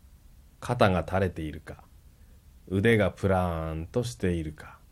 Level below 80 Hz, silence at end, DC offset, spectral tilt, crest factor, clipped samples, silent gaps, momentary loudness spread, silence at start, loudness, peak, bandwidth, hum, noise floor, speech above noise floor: -46 dBFS; 0.15 s; under 0.1%; -6.5 dB/octave; 22 dB; under 0.1%; none; 19 LU; 0.6 s; -28 LUFS; -8 dBFS; 13.5 kHz; none; -54 dBFS; 27 dB